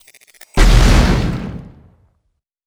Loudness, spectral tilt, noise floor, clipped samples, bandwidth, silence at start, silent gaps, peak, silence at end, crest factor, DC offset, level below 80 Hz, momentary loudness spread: -15 LUFS; -5.5 dB/octave; -68 dBFS; under 0.1%; 14.5 kHz; 0.55 s; none; 0 dBFS; 1.05 s; 14 dB; under 0.1%; -16 dBFS; 17 LU